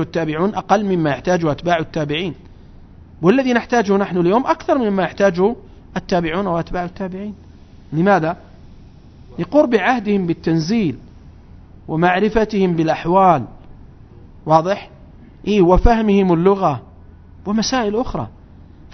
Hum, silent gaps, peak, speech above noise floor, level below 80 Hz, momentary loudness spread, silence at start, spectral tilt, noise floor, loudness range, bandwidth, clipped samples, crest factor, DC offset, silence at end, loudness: none; none; 0 dBFS; 25 dB; -34 dBFS; 14 LU; 0 s; -6.5 dB/octave; -41 dBFS; 4 LU; 6.4 kHz; under 0.1%; 18 dB; under 0.1%; 0 s; -17 LUFS